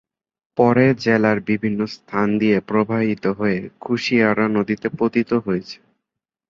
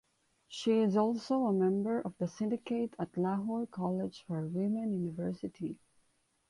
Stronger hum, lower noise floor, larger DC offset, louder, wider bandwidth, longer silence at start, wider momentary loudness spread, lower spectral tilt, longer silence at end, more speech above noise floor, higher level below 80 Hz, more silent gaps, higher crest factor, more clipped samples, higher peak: neither; first, -83 dBFS vs -74 dBFS; neither; first, -19 LUFS vs -34 LUFS; second, 7.4 kHz vs 11.5 kHz; about the same, 0.55 s vs 0.5 s; about the same, 9 LU vs 10 LU; about the same, -7.5 dB/octave vs -7.5 dB/octave; about the same, 0.75 s vs 0.75 s; first, 64 dB vs 41 dB; first, -56 dBFS vs -72 dBFS; neither; about the same, 18 dB vs 16 dB; neither; first, -2 dBFS vs -18 dBFS